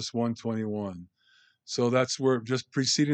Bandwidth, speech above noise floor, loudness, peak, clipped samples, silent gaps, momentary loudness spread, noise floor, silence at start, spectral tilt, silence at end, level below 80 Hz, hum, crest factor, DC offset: 9.2 kHz; 37 dB; -28 LUFS; -10 dBFS; under 0.1%; none; 10 LU; -64 dBFS; 0 s; -4.5 dB/octave; 0 s; -74 dBFS; none; 18 dB; under 0.1%